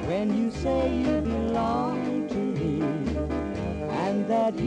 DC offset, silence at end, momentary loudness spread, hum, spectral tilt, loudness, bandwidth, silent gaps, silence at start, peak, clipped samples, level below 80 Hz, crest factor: under 0.1%; 0 s; 5 LU; none; -7.5 dB/octave; -27 LUFS; 9.8 kHz; none; 0 s; -14 dBFS; under 0.1%; -40 dBFS; 12 dB